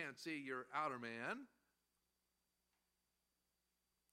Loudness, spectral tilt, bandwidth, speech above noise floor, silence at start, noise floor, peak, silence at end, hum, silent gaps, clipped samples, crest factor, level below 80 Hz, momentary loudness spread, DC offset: -47 LUFS; -4.5 dB/octave; 15 kHz; 41 dB; 0 s; -88 dBFS; -28 dBFS; 2.65 s; 60 Hz at -85 dBFS; none; under 0.1%; 24 dB; under -90 dBFS; 7 LU; under 0.1%